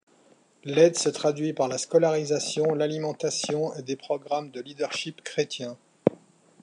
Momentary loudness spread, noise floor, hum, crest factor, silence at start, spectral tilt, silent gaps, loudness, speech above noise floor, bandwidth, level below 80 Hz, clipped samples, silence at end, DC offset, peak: 11 LU; -60 dBFS; none; 24 dB; 0.65 s; -4 dB/octave; none; -26 LUFS; 34 dB; 11 kHz; -76 dBFS; under 0.1%; 0.5 s; under 0.1%; -2 dBFS